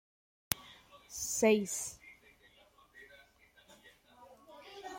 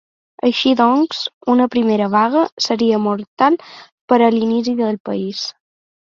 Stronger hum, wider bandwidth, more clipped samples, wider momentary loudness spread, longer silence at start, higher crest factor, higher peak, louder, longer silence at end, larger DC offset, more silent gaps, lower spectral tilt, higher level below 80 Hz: neither; first, 16.5 kHz vs 7.4 kHz; neither; first, 28 LU vs 9 LU; about the same, 0.5 s vs 0.45 s; first, 38 dB vs 16 dB; about the same, -2 dBFS vs 0 dBFS; second, -34 LUFS vs -16 LUFS; second, 0 s vs 0.6 s; neither; second, none vs 1.33-1.41 s, 2.52-2.57 s, 3.27-3.37 s, 3.92-4.08 s, 5.00-5.05 s; second, -3 dB/octave vs -5 dB/octave; second, -70 dBFS vs -62 dBFS